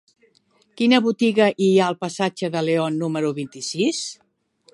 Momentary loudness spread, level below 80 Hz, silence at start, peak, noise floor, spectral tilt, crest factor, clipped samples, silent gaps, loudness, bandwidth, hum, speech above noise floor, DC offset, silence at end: 10 LU; -72 dBFS; 0.75 s; -4 dBFS; -61 dBFS; -5 dB/octave; 18 dB; under 0.1%; none; -21 LUFS; 11.5 kHz; none; 41 dB; under 0.1%; 0.6 s